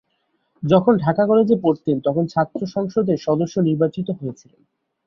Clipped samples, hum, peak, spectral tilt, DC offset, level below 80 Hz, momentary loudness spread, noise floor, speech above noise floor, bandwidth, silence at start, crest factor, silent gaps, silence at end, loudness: under 0.1%; none; -2 dBFS; -8.5 dB/octave; under 0.1%; -58 dBFS; 11 LU; -69 dBFS; 50 dB; 7.2 kHz; 0.6 s; 18 dB; none; 0.75 s; -19 LUFS